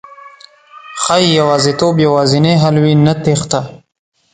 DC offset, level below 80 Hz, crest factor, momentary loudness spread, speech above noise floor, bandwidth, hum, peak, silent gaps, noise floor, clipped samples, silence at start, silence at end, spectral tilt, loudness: under 0.1%; -48 dBFS; 12 dB; 9 LU; 29 dB; 9.4 kHz; none; 0 dBFS; none; -40 dBFS; under 0.1%; 0.1 s; 0.55 s; -5.5 dB/octave; -12 LUFS